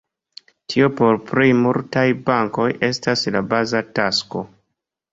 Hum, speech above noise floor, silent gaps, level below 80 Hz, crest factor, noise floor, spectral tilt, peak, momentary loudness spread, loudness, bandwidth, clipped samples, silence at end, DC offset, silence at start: none; 59 dB; none; -56 dBFS; 18 dB; -77 dBFS; -5.5 dB/octave; -2 dBFS; 8 LU; -18 LUFS; 7.8 kHz; under 0.1%; 0.65 s; under 0.1%; 0.7 s